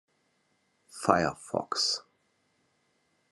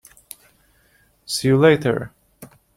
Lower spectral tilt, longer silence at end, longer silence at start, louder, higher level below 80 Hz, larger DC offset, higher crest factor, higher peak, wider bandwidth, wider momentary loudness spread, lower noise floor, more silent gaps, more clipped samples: second, -3 dB/octave vs -5.5 dB/octave; first, 1.3 s vs 0.3 s; second, 0.95 s vs 1.3 s; second, -29 LUFS vs -18 LUFS; second, -70 dBFS vs -56 dBFS; neither; first, 28 dB vs 20 dB; second, -6 dBFS vs -2 dBFS; second, 12.5 kHz vs 16.5 kHz; second, 9 LU vs 26 LU; first, -73 dBFS vs -59 dBFS; neither; neither